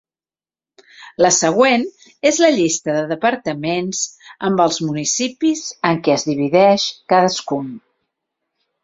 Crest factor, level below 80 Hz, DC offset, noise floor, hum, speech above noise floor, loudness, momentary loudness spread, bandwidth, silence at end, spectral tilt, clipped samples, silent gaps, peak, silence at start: 16 dB; -60 dBFS; under 0.1%; under -90 dBFS; none; over 73 dB; -17 LUFS; 10 LU; 7.8 kHz; 1.05 s; -3.5 dB/octave; under 0.1%; none; -2 dBFS; 1 s